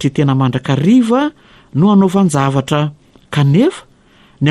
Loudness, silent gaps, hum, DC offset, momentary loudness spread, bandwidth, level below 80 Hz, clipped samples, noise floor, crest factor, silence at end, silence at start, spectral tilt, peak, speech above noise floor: -13 LUFS; none; none; under 0.1%; 10 LU; 12.5 kHz; -50 dBFS; under 0.1%; -47 dBFS; 12 dB; 0 s; 0 s; -7 dB/octave; -2 dBFS; 35 dB